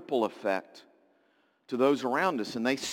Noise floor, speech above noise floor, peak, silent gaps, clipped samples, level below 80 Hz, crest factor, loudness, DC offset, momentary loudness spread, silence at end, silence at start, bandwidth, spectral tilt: -69 dBFS; 40 dB; -12 dBFS; none; under 0.1%; -80 dBFS; 18 dB; -29 LUFS; under 0.1%; 7 LU; 0 s; 0 s; 17 kHz; -4 dB/octave